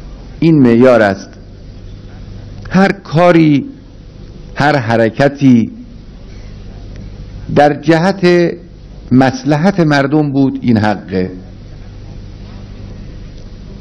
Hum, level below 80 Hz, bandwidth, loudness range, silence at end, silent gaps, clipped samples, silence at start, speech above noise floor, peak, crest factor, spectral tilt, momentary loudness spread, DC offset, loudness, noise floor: none; -34 dBFS; 11 kHz; 4 LU; 0 s; none; 1%; 0 s; 23 dB; 0 dBFS; 12 dB; -7.5 dB/octave; 25 LU; under 0.1%; -11 LUFS; -33 dBFS